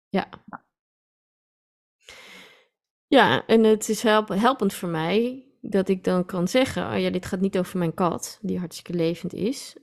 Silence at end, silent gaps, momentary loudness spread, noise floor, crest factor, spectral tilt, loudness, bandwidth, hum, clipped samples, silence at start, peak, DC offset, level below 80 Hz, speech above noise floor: 0.1 s; 0.79-1.99 s, 2.91-3.08 s; 12 LU; -55 dBFS; 20 dB; -5 dB/octave; -23 LUFS; 14.5 kHz; none; under 0.1%; 0.15 s; -4 dBFS; under 0.1%; -58 dBFS; 32 dB